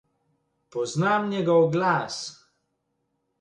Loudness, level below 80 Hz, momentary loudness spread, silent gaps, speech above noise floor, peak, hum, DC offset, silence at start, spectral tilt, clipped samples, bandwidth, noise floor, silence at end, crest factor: -24 LUFS; -70 dBFS; 14 LU; none; 53 dB; -10 dBFS; none; under 0.1%; 0.75 s; -5.5 dB/octave; under 0.1%; 10.5 kHz; -76 dBFS; 1.1 s; 18 dB